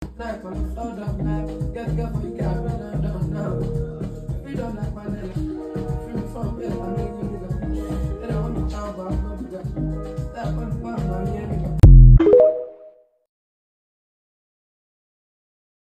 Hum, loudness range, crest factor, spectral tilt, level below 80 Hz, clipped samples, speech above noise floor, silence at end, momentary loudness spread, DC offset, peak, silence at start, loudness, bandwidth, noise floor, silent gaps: none; 12 LU; 20 dB; -9.5 dB/octave; -24 dBFS; under 0.1%; 23 dB; 2.95 s; 16 LU; under 0.1%; 0 dBFS; 0 s; -22 LUFS; 7.4 kHz; -48 dBFS; none